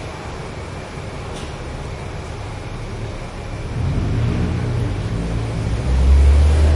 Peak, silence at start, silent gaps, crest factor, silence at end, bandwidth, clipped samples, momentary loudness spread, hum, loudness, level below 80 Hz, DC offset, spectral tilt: -4 dBFS; 0 s; none; 16 dB; 0 s; 11 kHz; under 0.1%; 16 LU; none; -22 LUFS; -22 dBFS; under 0.1%; -7 dB/octave